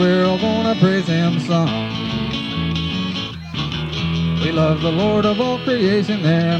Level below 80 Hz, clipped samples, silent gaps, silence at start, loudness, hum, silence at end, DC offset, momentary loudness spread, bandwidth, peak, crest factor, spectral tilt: -40 dBFS; under 0.1%; none; 0 s; -19 LUFS; none; 0 s; under 0.1%; 7 LU; 8.2 kHz; -2 dBFS; 16 dB; -7 dB/octave